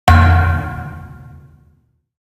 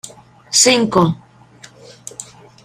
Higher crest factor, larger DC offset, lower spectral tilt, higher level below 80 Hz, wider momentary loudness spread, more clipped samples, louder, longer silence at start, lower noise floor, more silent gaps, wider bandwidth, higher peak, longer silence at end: about the same, 16 dB vs 18 dB; neither; first, -6.5 dB/octave vs -3 dB/octave; first, -30 dBFS vs -52 dBFS; about the same, 24 LU vs 24 LU; neither; about the same, -14 LUFS vs -13 LUFS; about the same, 0.05 s vs 0.05 s; first, -56 dBFS vs -44 dBFS; neither; second, 13.5 kHz vs 15.5 kHz; about the same, 0 dBFS vs 0 dBFS; first, 1.15 s vs 0.4 s